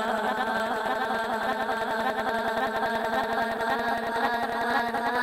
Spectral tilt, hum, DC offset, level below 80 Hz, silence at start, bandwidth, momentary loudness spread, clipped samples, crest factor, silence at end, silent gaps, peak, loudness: -4 dB/octave; none; under 0.1%; -58 dBFS; 0 s; 17 kHz; 1 LU; under 0.1%; 14 dB; 0 s; none; -12 dBFS; -27 LUFS